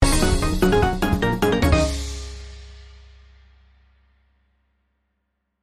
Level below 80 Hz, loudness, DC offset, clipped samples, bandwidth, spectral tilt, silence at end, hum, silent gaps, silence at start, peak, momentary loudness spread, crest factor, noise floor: -28 dBFS; -20 LUFS; under 0.1%; under 0.1%; 15.5 kHz; -5 dB/octave; 2.75 s; none; none; 0 s; -2 dBFS; 19 LU; 20 dB; -75 dBFS